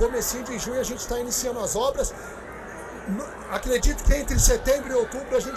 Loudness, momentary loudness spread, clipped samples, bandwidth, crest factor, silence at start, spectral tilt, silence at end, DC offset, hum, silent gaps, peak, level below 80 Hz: -25 LUFS; 16 LU; under 0.1%; 16 kHz; 18 dB; 0 s; -3.5 dB/octave; 0 s; under 0.1%; none; none; -8 dBFS; -30 dBFS